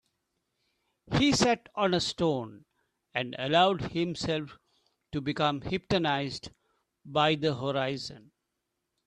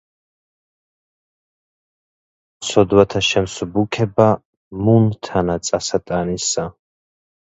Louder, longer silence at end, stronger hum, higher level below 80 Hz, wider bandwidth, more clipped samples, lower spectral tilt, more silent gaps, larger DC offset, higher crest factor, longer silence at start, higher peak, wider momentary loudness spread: second, -29 LUFS vs -18 LUFS; about the same, 0.85 s vs 0.85 s; neither; second, -56 dBFS vs -46 dBFS; first, 12 kHz vs 8.2 kHz; neither; about the same, -4.5 dB/octave vs -5 dB/octave; second, none vs 4.45-4.71 s; neither; about the same, 20 dB vs 20 dB; second, 1.1 s vs 2.6 s; second, -10 dBFS vs 0 dBFS; first, 13 LU vs 9 LU